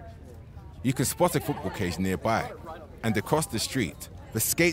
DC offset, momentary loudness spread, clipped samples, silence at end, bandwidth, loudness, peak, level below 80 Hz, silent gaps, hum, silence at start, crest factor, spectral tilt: under 0.1%; 20 LU; under 0.1%; 0 s; 16 kHz; -28 LUFS; -10 dBFS; -48 dBFS; none; none; 0 s; 20 dB; -4.5 dB/octave